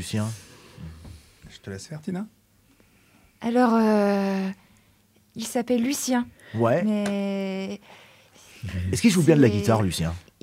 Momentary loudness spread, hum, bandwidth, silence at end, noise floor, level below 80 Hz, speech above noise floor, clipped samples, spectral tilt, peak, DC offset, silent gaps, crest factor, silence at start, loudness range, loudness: 22 LU; none; 16 kHz; 0.25 s; -61 dBFS; -52 dBFS; 37 dB; under 0.1%; -6 dB/octave; -4 dBFS; under 0.1%; none; 20 dB; 0 s; 6 LU; -24 LUFS